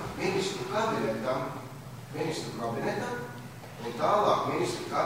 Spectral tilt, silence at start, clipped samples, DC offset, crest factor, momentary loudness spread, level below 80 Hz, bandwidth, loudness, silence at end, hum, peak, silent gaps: -5 dB/octave; 0 s; under 0.1%; 0.1%; 20 dB; 16 LU; -60 dBFS; 16 kHz; -30 LUFS; 0 s; none; -10 dBFS; none